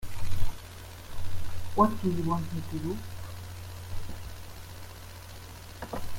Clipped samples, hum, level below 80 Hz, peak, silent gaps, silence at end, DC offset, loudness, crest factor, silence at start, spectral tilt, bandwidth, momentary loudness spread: under 0.1%; none; -42 dBFS; -10 dBFS; none; 0 s; under 0.1%; -34 LUFS; 18 dB; 0 s; -6.5 dB/octave; 16.5 kHz; 19 LU